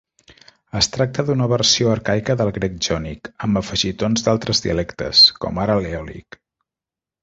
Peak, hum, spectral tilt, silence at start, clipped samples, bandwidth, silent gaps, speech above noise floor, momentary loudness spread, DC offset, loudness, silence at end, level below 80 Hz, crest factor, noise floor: -2 dBFS; none; -4 dB/octave; 0.75 s; under 0.1%; 8 kHz; none; 70 dB; 14 LU; under 0.1%; -18 LUFS; 1.05 s; -42 dBFS; 20 dB; -89 dBFS